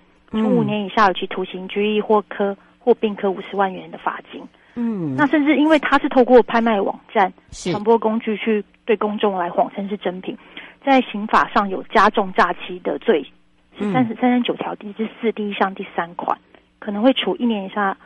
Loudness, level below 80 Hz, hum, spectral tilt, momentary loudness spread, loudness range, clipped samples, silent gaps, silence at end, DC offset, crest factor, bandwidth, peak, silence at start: -19 LUFS; -52 dBFS; none; -6 dB/octave; 12 LU; 5 LU; under 0.1%; none; 0.1 s; under 0.1%; 16 dB; 10 kHz; -2 dBFS; 0.3 s